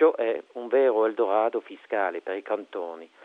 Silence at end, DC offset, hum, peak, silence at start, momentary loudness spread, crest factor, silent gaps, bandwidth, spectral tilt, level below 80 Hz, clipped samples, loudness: 0.2 s; under 0.1%; none; -8 dBFS; 0 s; 12 LU; 16 dB; none; 4.1 kHz; -6 dB/octave; -80 dBFS; under 0.1%; -26 LUFS